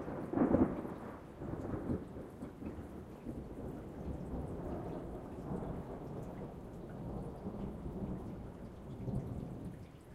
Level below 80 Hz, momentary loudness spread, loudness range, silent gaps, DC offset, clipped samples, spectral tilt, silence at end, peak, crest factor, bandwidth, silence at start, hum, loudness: -52 dBFS; 13 LU; 6 LU; none; under 0.1%; under 0.1%; -9.5 dB/octave; 0 s; -16 dBFS; 26 dB; 15 kHz; 0 s; none; -42 LUFS